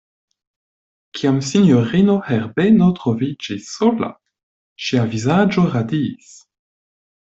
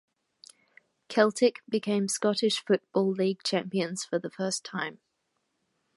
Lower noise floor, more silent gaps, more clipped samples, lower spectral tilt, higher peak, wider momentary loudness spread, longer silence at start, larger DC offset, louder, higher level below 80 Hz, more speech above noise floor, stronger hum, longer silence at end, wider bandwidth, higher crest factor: first, under -90 dBFS vs -78 dBFS; first, 4.43-4.76 s vs none; neither; first, -6.5 dB/octave vs -4 dB/octave; first, -4 dBFS vs -8 dBFS; first, 12 LU vs 7 LU; about the same, 1.15 s vs 1.1 s; neither; first, -17 LUFS vs -28 LUFS; first, -54 dBFS vs -82 dBFS; first, over 74 dB vs 50 dB; neither; first, 1.15 s vs 1 s; second, 8 kHz vs 11.5 kHz; second, 16 dB vs 22 dB